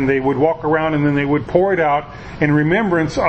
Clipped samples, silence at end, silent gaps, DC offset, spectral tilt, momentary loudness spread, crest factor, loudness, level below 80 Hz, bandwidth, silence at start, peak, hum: under 0.1%; 0 s; none; under 0.1%; -7.5 dB/octave; 4 LU; 16 dB; -16 LUFS; -40 dBFS; 8.4 kHz; 0 s; 0 dBFS; none